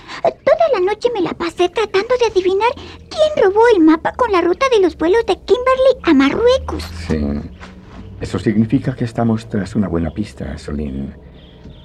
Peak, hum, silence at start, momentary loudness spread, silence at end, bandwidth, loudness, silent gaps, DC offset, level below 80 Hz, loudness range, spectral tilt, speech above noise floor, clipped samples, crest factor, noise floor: -2 dBFS; none; 0.05 s; 14 LU; 0.15 s; 11.5 kHz; -16 LUFS; none; under 0.1%; -38 dBFS; 7 LU; -6.5 dB/octave; 22 dB; under 0.1%; 12 dB; -38 dBFS